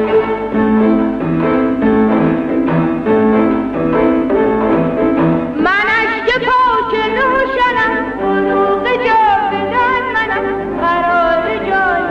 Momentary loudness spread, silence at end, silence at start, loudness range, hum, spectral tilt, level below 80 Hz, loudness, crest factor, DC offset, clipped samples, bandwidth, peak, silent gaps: 4 LU; 0 s; 0 s; 1 LU; none; -7.5 dB/octave; -38 dBFS; -13 LUFS; 12 dB; under 0.1%; under 0.1%; 7.4 kHz; -2 dBFS; none